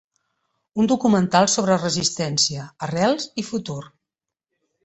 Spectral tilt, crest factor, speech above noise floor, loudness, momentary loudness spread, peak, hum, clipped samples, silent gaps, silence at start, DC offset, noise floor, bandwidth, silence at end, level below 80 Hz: -4 dB/octave; 20 dB; 65 dB; -20 LUFS; 13 LU; -2 dBFS; none; under 0.1%; none; 0.75 s; under 0.1%; -85 dBFS; 8.4 kHz; 0.95 s; -58 dBFS